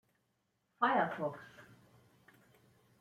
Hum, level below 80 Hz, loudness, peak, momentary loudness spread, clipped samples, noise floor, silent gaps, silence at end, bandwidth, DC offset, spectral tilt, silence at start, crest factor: none; -84 dBFS; -35 LUFS; -18 dBFS; 21 LU; under 0.1%; -81 dBFS; none; 1.35 s; 15.5 kHz; under 0.1%; -6.5 dB/octave; 0.8 s; 22 dB